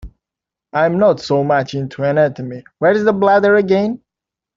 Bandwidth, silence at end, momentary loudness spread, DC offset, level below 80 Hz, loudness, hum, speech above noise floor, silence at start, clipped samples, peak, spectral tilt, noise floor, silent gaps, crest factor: 7.6 kHz; 0.6 s; 11 LU; under 0.1%; -48 dBFS; -15 LUFS; none; 71 dB; 0.05 s; under 0.1%; 0 dBFS; -7 dB/octave; -86 dBFS; none; 16 dB